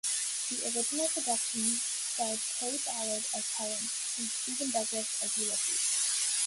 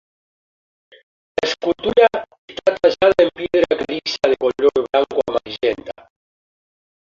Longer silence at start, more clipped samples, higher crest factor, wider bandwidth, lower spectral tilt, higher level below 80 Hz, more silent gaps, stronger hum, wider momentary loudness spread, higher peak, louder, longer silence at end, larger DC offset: second, 0.05 s vs 1.4 s; neither; about the same, 16 dB vs 18 dB; first, 12 kHz vs 7.6 kHz; second, 0.5 dB/octave vs -4.5 dB/octave; second, -80 dBFS vs -54 dBFS; second, none vs 2.38-2.48 s; neither; second, 5 LU vs 10 LU; second, -16 dBFS vs -2 dBFS; second, -30 LUFS vs -18 LUFS; second, 0 s vs 1.3 s; neither